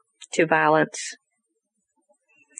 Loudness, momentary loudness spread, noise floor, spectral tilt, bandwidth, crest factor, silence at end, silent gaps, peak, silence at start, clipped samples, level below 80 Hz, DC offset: -22 LUFS; 14 LU; -77 dBFS; -4 dB/octave; 11 kHz; 20 dB; 1.45 s; none; -6 dBFS; 0.2 s; under 0.1%; -80 dBFS; under 0.1%